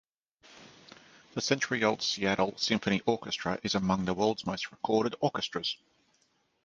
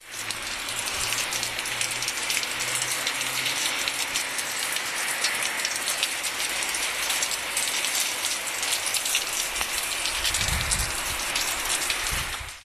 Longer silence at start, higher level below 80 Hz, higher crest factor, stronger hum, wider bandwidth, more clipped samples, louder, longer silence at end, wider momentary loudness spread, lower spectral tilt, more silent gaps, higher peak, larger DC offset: first, 0.5 s vs 0 s; second, -62 dBFS vs -46 dBFS; about the same, 24 dB vs 22 dB; neither; second, 9.6 kHz vs 14.5 kHz; neither; second, -30 LUFS vs -25 LUFS; first, 0.9 s vs 0 s; first, 7 LU vs 3 LU; first, -4 dB/octave vs 0 dB/octave; neither; about the same, -8 dBFS vs -6 dBFS; neither